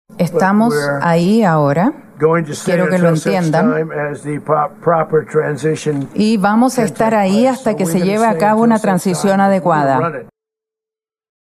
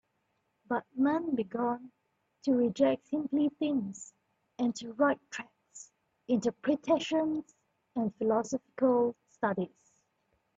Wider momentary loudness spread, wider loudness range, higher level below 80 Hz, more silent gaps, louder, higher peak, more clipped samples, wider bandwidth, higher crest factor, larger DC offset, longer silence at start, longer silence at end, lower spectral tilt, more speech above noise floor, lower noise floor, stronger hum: second, 6 LU vs 13 LU; about the same, 2 LU vs 3 LU; first, -56 dBFS vs -76 dBFS; neither; first, -14 LUFS vs -31 LUFS; first, 0 dBFS vs -14 dBFS; neither; first, 14 kHz vs 8 kHz; about the same, 14 dB vs 18 dB; neither; second, 0.2 s vs 0.7 s; first, 1.2 s vs 0.9 s; about the same, -6.5 dB/octave vs -5.5 dB/octave; first, 76 dB vs 48 dB; first, -89 dBFS vs -78 dBFS; neither